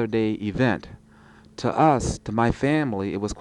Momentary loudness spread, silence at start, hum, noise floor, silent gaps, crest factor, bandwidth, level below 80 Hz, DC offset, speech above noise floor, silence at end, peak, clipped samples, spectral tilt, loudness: 9 LU; 0 s; none; -51 dBFS; none; 18 dB; 11 kHz; -42 dBFS; under 0.1%; 28 dB; 0 s; -6 dBFS; under 0.1%; -6.5 dB/octave; -23 LUFS